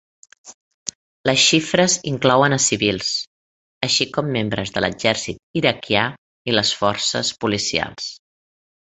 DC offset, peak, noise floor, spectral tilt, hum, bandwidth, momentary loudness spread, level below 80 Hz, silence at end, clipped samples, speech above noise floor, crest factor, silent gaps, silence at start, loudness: under 0.1%; 0 dBFS; under -90 dBFS; -3 dB/octave; none; 8.4 kHz; 15 LU; -52 dBFS; 0.8 s; under 0.1%; over 71 dB; 20 dB; 0.54-0.86 s, 0.95-1.24 s, 3.27-3.81 s, 5.39-5.54 s, 6.18-6.45 s; 0.45 s; -19 LUFS